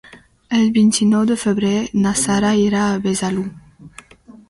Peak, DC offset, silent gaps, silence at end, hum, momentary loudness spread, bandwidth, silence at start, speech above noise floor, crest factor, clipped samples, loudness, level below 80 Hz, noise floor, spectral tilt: -6 dBFS; under 0.1%; none; 0.6 s; none; 7 LU; 11.5 kHz; 0.15 s; 28 dB; 12 dB; under 0.1%; -17 LUFS; -48 dBFS; -44 dBFS; -5 dB/octave